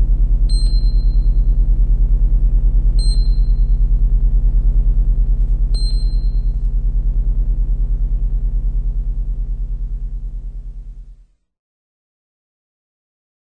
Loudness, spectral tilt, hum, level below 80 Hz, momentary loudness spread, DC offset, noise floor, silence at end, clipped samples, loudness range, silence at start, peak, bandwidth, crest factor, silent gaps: -20 LUFS; -7 dB/octave; none; -14 dBFS; 9 LU; under 0.1%; -44 dBFS; 2.35 s; under 0.1%; 13 LU; 0 s; -4 dBFS; 8.8 kHz; 10 dB; none